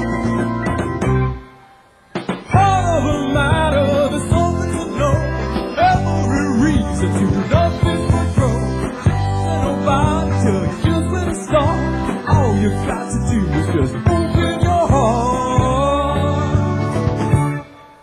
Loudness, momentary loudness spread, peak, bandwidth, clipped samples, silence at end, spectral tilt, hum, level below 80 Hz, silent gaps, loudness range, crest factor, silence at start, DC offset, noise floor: -17 LUFS; 6 LU; 0 dBFS; 12 kHz; under 0.1%; 0.15 s; -7 dB/octave; none; -26 dBFS; none; 1 LU; 16 dB; 0 s; under 0.1%; -48 dBFS